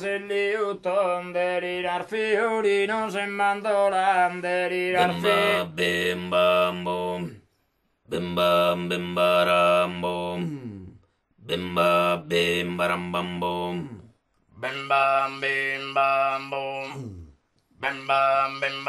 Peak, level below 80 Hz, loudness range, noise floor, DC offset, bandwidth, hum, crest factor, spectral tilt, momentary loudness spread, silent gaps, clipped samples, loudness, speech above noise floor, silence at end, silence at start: -8 dBFS; -62 dBFS; 3 LU; -71 dBFS; under 0.1%; 13 kHz; none; 18 dB; -5 dB/octave; 11 LU; none; under 0.1%; -24 LUFS; 47 dB; 0 s; 0 s